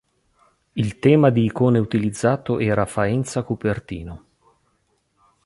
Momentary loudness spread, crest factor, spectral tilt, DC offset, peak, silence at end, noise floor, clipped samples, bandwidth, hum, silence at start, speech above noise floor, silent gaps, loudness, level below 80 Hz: 15 LU; 18 dB; -7 dB/octave; under 0.1%; -2 dBFS; 1.3 s; -67 dBFS; under 0.1%; 11.5 kHz; none; 0.75 s; 48 dB; none; -20 LUFS; -48 dBFS